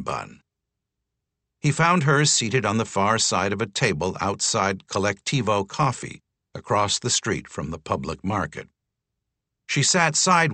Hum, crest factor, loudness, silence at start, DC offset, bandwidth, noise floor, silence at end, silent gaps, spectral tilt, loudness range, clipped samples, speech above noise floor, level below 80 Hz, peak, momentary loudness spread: none; 20 dB; -22 LUFS; 0 s; under 0.1%; 9 kHz; -83 dBFS; 0 s; none; -3.5 dB/octave; 5 LU; under 0.1%; 60 dB; -54 dBFS; -4 dBFS; 14 LU